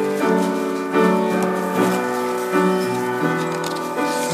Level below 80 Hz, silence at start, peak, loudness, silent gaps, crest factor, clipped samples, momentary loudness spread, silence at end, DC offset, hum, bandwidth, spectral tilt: -68 dBFS; 0 s; -4 dBFS; -20 LUFS; none; 16 dB; under 0.1%; 5 LU; 0 s; under 0.1%; none; 15.5 kHz; -5.5 dB/octave